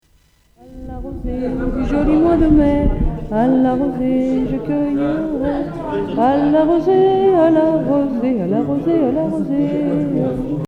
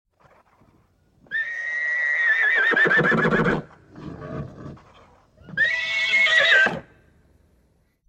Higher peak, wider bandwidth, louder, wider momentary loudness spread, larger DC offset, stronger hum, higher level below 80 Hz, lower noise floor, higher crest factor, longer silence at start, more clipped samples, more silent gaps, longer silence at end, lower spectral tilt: first, -2 dBFS vs -6 dBFS; second, 6.2 kHz vs 10.5 kHz; first, -16 LUFS vs -19 LUFS; second, 10 LU vs 20 LU; neither; neither; first, -28 dBFS vs -54 dBFS; second, -55 dBFS vs -63 dBFS; about the same, 14 dB vs 18 dB; second, 0.65 s vs 1.3 s; neither; neither; second, 0 s vs 1.25 s; first, -9.5 dB/octave vs -4 dB/octave